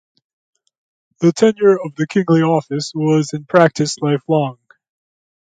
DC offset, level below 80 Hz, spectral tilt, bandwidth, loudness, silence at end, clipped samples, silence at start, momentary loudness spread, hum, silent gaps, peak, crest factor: under 0.1%; -62 dBFS; -6 dB/octave; 9.4 kHz; -16 LUFS; 0.95 s; under 0.1%; 1.2 s; 6 LU; none; none; 0 dBFS; 16 dB